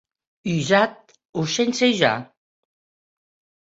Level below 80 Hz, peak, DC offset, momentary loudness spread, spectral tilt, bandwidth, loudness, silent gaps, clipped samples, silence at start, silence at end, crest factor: -62 dBFS; -4 dBFS; under 0.1%; 12 LU; -4.5 dB/octave; 8 kHz; -21 LUFS; 1.25-1.33 s; under 0.1%; 0.45 s; 1.4 s; 20 dB